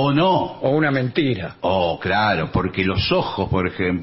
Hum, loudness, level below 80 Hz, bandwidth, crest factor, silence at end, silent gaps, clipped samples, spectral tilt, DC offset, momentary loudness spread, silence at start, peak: none; -20 LUFS; -42 dBFS; 5.8 kHz; 14 dB; 0 s; none; under 0.1%; -10.5 dB/octave; under 0.1%; 4 LU; 0 s; -6 dBFS